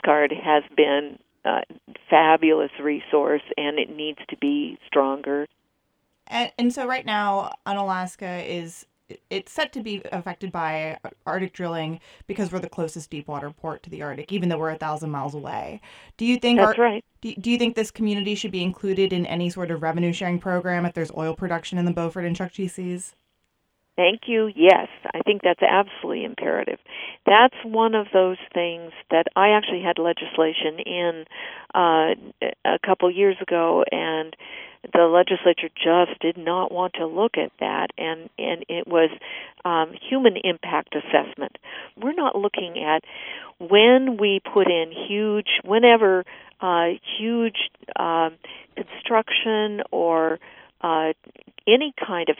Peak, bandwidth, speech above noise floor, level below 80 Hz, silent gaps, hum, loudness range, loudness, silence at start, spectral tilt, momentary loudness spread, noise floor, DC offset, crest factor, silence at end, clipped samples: 0 dBFS; 11.5 kHz; 50 dB; -64 dBFS; none; none; 9 LU; -22 LUFS; 0.05 s; -5.5 dB/octave; 15 LU; -72 dBFS; under 0.1%; 22 dB; 0.05 s; under 0.1%